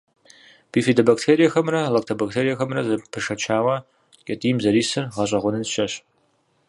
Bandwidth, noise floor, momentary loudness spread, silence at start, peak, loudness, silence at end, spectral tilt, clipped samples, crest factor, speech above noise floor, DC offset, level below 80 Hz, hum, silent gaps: 11.5 kHz; -65 dBFS; 10 LU; 0.75 s; -2 dBFS; -21 LUFS; 0.7 s; -5 dB/octave; under 0.1%; 20 dB; 44 dB; under 0.1%; -60 dBFS; none; none